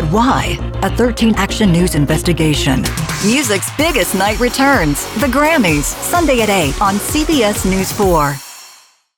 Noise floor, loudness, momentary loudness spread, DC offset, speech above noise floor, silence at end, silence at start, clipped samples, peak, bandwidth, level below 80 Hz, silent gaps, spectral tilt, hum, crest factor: -45 dBFS; -14 LUFS; 5 LU; under 0.1%; 31 dB; 0.45 s; 0 s; under 0.1%; -4 dBFS; over 20 kHz; -26 dBFS; none; -4.5 dB/octave; none; 10 dB